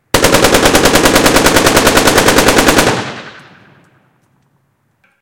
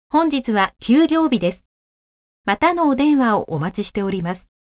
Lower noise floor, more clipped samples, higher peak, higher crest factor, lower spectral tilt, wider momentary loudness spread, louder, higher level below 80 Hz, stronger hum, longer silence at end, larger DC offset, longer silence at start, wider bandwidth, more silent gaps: second, -58 dBFS vs under -90 dBFS; first, 0.9% vs under 0.1%; first, 0 dBFS vs -4 dBFS; second, 10 dB vs 16 dB; second, -3 dB/octave vs -10 dB/octave; second, 6 LU vs 9 LU; first, -8 LUFS vs -19 LUFS; first, -26 dBFS vs -50 dBFS; neither; first, 1.85 s vs 0.3 s; neither; about the same, 0.15 s vs 0.15 s; first, over 20 kHz vs 4 kHz; second, none vs 1.65-2.44 s